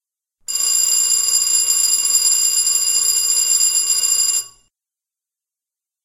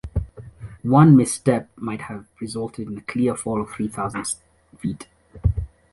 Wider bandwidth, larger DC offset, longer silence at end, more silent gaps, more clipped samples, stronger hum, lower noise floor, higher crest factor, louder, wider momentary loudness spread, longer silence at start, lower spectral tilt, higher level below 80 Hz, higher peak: first, 16.5 kHz vs 11.5 kHz; neither; first, 1.55 s vs 0.25 s; neither; neither; neither; first, -87 dBFS vs -39 dBFS; about the same, 16 dB vs 20 dB; first, -13 LUFS vs -22 LUFS; second, 3 LU vs 19 LU; first, 0.5 s vs 0.05 s; second, 4.5 dB/octave vs -7 dB/octave; second, -60 dBFS vs -36 dBFS; about the same, -2 dBFS vs -2 dBFS